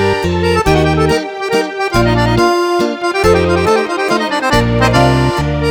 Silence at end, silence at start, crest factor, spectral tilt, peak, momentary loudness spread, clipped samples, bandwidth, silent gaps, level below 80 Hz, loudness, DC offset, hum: 0 s; 0 s; 12 dB; -6 dB/octave; 0 dBFS; 4 LU; under 0.1%; over 20 kHz; none; -26 dBFS; -12 LUFS; under 0.1%; none